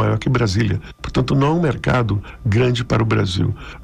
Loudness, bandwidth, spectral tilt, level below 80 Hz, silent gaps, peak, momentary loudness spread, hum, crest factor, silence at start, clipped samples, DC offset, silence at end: -19 LUFS; 10 kHz; -7 dB/octave; -36 dBFS; none; -8 dBFS; 6 LU; none; 10 dB; 0 s; under 0.1%; under 0.1%; 0 s